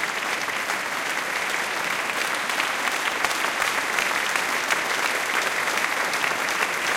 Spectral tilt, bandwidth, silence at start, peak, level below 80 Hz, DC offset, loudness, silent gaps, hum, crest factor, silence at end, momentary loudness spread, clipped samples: -0.5 dB/octave; 17 kHz; 0 s; -6 dBFS; -64 dBFS; under 0.1%; -23 LUFS; none; none; 20 dB; 0 s; 3 LU; under 0.1%